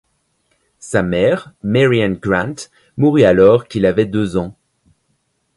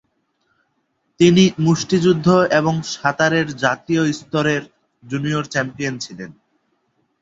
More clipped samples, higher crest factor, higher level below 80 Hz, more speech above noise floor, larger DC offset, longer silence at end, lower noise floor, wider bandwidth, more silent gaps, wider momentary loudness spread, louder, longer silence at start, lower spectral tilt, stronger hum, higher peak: neither; about the same, 16 dB vs 18 dB; first, -44 dBFS vs -56 dBFS; about the same, 51 dB vs 51 dB; neither; first, 1.05 s vs 0.9 s; about the same, -66 dBFS vs -69 dBFS; first, 11.5 kHz vs 7.8 kHz; neither; about the same, 12 LU vs 11 LU; first, -15 LUFS vs -18 LUFS; second, 0.85 s vs 1.2 s; about the same, -6.5 dB/octave vs -5.5 dB/octave; neither; about the same, 0 dBFS vs -2 dBFS